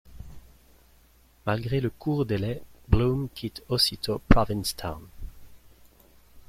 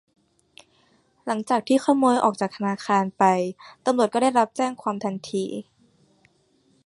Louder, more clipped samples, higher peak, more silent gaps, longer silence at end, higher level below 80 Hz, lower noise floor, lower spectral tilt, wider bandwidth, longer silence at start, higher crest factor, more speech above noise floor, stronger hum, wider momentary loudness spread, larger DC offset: second, -27 LUFS vs -23 LUFS; neither; about the same, -2 dBFS vs -4 dBFS; neither; second, 0.1 s vs 1.25 s; first, -36 dBFS vs -72 dBFS; second, -58 dBFS vs -63 dBFS; about the same, -5.5 dB/octave vs -5.5 dB/octave; first, 16 kHz vs 11.5 kHz; second, 0.1 s vs 1.25 s; first, 26 dB vs 20 dB; second, 33 dB vs 41 dB; neither; first, 24 LU vs 10 LU; neither